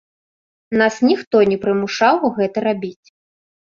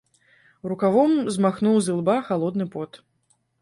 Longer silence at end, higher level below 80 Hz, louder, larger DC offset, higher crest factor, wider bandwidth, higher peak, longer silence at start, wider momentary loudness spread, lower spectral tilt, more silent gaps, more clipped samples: first, 0.85 s vs 0.65 s; first, -60 dBFS vs -66 dBFS; first, -17 LUFS vs -22 LUFS; neither; about the same, 18 dB vs 16 dB; second, 7.4 kHz vs 11.5 kHz; first, -2 dBFS vs -6 dBFS; about the same, 0.7 s vs 0.65 s; second, 7 LU vs 14 LU; about the same, -5.5 dB/octave vs -6.5 dB/octave; first, 1.27-1.31 s vs none; neither